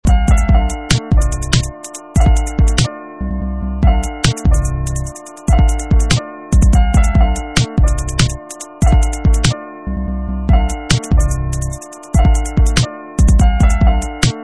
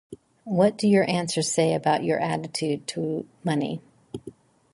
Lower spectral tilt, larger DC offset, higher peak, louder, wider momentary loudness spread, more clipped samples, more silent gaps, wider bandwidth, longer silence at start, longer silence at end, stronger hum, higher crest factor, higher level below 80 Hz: about the same, -5 dB/octave vs -5 dB/octave; neither; first, 0 dBFS vs -8 dBFS; first, -15 LUFS vs -24 LUFS; second, 10 LU vs 19 LU; neither; neither; about the same, 11 kHz vs 11.5 kHz; about the same, 0.05 s vs 0.1 s; second, 0 s vs 0.45 s; neither; second, 12 dB vs 18 dB; first, -14 dBFS vs -64 dBFS